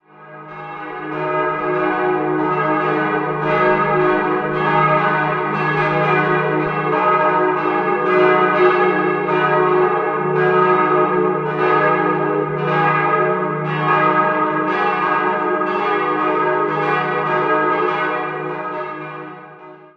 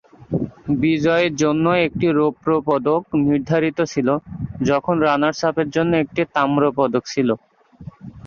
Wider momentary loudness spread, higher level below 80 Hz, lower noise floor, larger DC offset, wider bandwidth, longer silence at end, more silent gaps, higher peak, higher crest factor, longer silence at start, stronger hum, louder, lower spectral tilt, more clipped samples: about the same, 10 LU vs 8 LU; second, -56 dBFS vs -50 dBFS; about the same, -39 dBFS vs -40 dBFS; neither; second, 6.2 kHz vs 7.4 kHz; first, 0.2 s vs 0 s; neither; first, 0 dBFS vs -4 dBFS; about the same, 16 dB vs 16 dB; about the same, 0.2 s vs 0.2 s; neither; about the same, -17 LUFS vs -19 LUFS; first, -8.5 dB/octave vs -6.5 dB/octave; neither